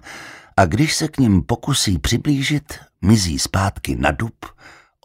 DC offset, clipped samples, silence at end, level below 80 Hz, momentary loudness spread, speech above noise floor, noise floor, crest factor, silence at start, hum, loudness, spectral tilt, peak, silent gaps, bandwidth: under 0.1%; under 0.1%; 0.35 s; -34 dBFS; 17 LU; 20 dB; -38 dBFS; 18 dB; 0.05 s; none; -18 LUFS; -4.5 dB/octave; 0 dBFS; none; 16 kHz